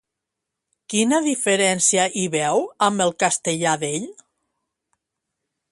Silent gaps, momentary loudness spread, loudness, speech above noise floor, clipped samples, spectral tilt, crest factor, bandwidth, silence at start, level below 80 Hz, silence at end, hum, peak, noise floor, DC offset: none; 8 LU; -20 LUFS; 62 dB; under 0.1%; -3 dB/octave; 20 dB; 11.5 kHz; 0.9 s; -68 dBFS; 1.6 s; none; -4 dBFS; -83 dBFS; under 0.1%